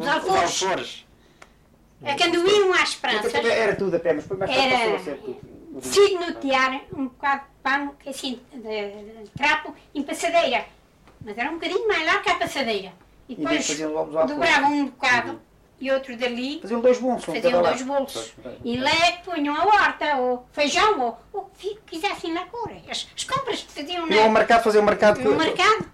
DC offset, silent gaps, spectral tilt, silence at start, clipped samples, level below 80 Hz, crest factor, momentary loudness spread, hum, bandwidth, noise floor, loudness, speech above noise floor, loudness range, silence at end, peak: under 0.1%; none; -3 dB/octave; 0 s; under 0.1%; -54 dBFS; 16 dB; 16 LU; none; 14.5 kHz; -55 dBFS; -22 LUFS; 33 dB; 5 LU; 0.05 s; -6 dBFS